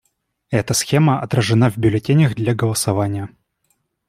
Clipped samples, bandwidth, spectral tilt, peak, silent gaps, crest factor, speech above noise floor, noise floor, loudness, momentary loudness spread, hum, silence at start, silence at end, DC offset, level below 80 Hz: under 0.1%; 15.5 kHz; -5.5 dB/octave; -2 dBFS; none; 16 dB; 51 dB; -67 dBFS; -18 LUFS; 8 LU; none; 0.5 s; 0.8 s; under 0.1%; -50 dBFS